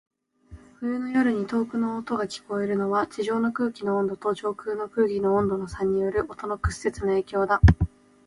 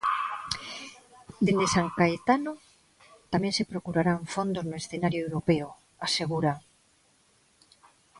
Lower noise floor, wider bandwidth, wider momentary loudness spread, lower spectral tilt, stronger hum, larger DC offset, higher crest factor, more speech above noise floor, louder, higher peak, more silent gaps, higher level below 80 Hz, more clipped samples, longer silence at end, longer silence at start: second, -49 dBFS vs -65 dBFS; about the same, 11.5 kHz vs 11.5 kHz; second, 8 LU vs 13 LU; first, -7.5 dB/octave vs -5 dB/octave; neither; neither; about the same, 20 dB vs 22 dB; second, 25 dB vs 38 dB; about the same, -26 LUFS vs -28 LUFS; first, -4 dBFS vs -8 dBFS; neither; first, -34 dBFS vs -58 dBFS; neither; second, 0.4 s vs 1.6 s; first, 0.5 s vs 0 s